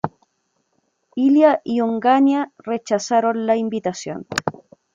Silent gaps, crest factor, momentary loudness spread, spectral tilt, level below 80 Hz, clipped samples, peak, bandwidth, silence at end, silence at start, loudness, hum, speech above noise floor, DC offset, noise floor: none; 18 dB; 13 LU; -5 dB/octave; -66 dBFS; under 0.1%; -2 dBFS; 7.6 kHz; 0.45 s; 0.05 s; -19 LUFS; none; 51 dB; under 0.1%; -69 dBFS